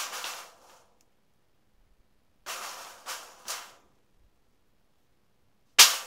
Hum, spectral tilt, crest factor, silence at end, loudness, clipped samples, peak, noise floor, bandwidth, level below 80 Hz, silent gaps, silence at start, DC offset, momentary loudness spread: none; 3.5 dB/octave; 32 dB; 0 s; -25 LUFS; under 0.1%; 0 dBFS; -72 dBFS; 16 kHz; -72 dBFS; none; 0 s; under 0.1%; 24 LU